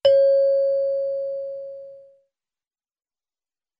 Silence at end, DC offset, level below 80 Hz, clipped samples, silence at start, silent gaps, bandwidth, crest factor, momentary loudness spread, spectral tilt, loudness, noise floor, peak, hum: 1.8 s; under 0.1%; -72 dBFS; under 0.1%; 0.05 s; none; 5.6 kHz; 18 dB; 19 LU; -3.5 dB/octave; -21 LUFS; under -90 dBFS; -6 dBFS; none